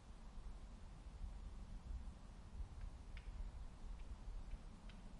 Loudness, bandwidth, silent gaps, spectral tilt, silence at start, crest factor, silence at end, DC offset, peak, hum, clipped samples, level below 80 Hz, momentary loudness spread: -57 LUFS; 11 kHz; none; -6 dB/octave; 0 s; 14 dB; 0 s; under 0.1%; -38 dBFS; none; under 0.1%; -52 dBFS; 5 LU